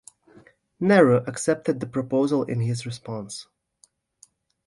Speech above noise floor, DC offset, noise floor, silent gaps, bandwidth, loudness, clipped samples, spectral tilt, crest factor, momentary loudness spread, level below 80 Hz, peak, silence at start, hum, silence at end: 40 dB; under 0.1%; -62 dBFS; none; 11.5 kHz; -23 LUFS; under 0.1%; -6 dB/octave; 22 dB; 16 LU; -64 dBFS; -4 dBFS; 0.8 s; none; 1.25 s